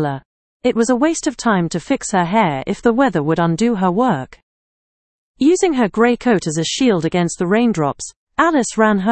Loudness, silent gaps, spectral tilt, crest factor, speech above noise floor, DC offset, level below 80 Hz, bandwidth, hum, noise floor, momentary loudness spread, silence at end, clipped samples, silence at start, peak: -17 LUFS; 0.25-0.60 s, 4.43-5.34 s, 8.16-8.27 s; -5 dB/octave; 16 dB; over 74 dB; under 0.1%; -48 dBFS; 8.8 kHz; none; under -90 dBFS; 6 LU; 0 s; under 0.1%; 0 s; 0 dBFS